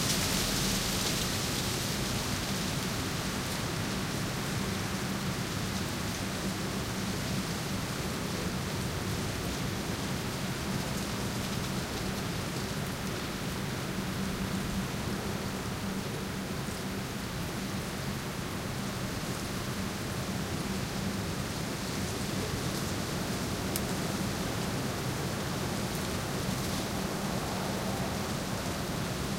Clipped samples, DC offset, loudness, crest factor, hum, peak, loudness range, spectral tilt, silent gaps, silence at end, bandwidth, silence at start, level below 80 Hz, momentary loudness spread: under 0.1%; under 0.1%; -33 LUFS; 24 dB; none; -10 dBFS; 3 LU; -4 dB/octave; none; 0 s; 16 kHz; 0 s; -46 dBFS; 4 LU